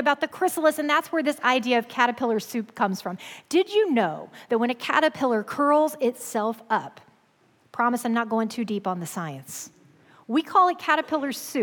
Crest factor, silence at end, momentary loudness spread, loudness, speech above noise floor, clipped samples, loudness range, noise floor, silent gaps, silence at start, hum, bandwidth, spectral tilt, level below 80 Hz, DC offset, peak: 18 dB; 0 s; 12 LU; -24 LUFS; 38 dB; under 0.1%; 5 LU; -62 dBFS; none; 0 s; none; 19 kHz; -4 dB/octave; -78 dBFS; under 0.1%; -8 dBFS